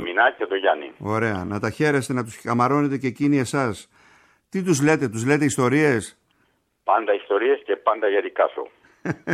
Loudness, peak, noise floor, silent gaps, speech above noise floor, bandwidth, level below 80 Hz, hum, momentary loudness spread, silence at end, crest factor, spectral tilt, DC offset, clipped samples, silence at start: -22 LUFS; -6 dBFS; -67 dBFS; none; 45 dB; 15 kHz; -62 dBFS; none; 10 LU; 0 s; 16 dB; -5.5 dB/octave; under 0.1%; under 0.1%; 0 s